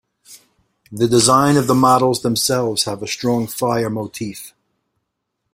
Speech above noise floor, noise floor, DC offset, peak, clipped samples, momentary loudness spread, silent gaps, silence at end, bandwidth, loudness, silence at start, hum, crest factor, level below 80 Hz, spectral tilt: 59 dB; -75 dBFS; under 0.1%; 0 dBFS; under 0.1%; 15 LU; none; 1.05 s; 16.5 kHz; -16 LUFS; 0.3 s; none; 18 dB; -54 dBFS; -4.5 dB/octave